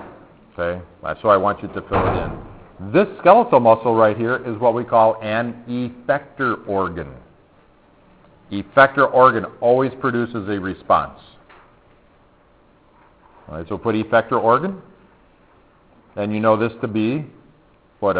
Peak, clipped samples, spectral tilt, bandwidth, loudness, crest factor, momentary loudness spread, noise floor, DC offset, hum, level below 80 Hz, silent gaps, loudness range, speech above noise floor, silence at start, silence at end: 0 dBFS; under 0.1%; -10.5 dB/octave; 4 kHz; -18 LUFS; 20 dB; 17 LU; -54 dBFS; under 0.1%; none; -46 dBFS; none; 9 LU; 36 dB; 0 s; 0 s